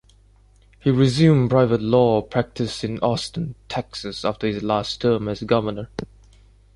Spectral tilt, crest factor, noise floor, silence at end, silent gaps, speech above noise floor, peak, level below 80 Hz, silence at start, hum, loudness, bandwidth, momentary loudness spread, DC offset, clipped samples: -7 dB/octave; 18 dB; -53 dBFS; 0.7 s; none; 33 dB; -4 dBFS; -48 dBFS; 0.85 s; none; -21 LUFS; 11.5 kHz; 14 LU; under 0.1%; under 0.1%